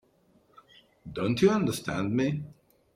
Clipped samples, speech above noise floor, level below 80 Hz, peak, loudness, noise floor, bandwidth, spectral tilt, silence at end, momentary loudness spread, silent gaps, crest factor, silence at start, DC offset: under 0.1%; 38 dB; -60 dBFS; -10 dBFS; -28 LUFS; -65 dBFS; 16 kHz; -6 dB/octave; 0.45 s; 19 LU; none; 20 dB; 1.05 s; under 0.1%